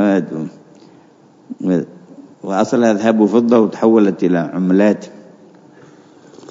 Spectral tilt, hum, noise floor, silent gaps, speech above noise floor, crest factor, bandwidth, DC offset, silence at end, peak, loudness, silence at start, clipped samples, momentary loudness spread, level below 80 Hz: -7.5 dB/octave; none; -47 dBFS; none; 33 dB; 16 dB; 7.8 kHz; under 0.1%; 1.3 s; 0 dBFS; -15 LUFS; 0 s; under 0.1%; 17 LU; -68 dBFS